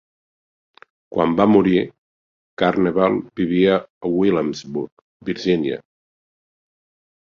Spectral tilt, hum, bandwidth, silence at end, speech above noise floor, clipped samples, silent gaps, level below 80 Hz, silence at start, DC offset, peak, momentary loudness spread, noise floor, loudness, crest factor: -7.5 dB/octave; none; 7.2 kHz; 1.45 s; over 72 dB; under 0.1%; 1.98-2.57 s, 3.90-4.01 s, 4.92-5.20 s; -54 dBFS; 1.1 s; under 0.1%; -2 dBFS; 14 LU; under -90 dBFS; -19 LUFS; 20 dB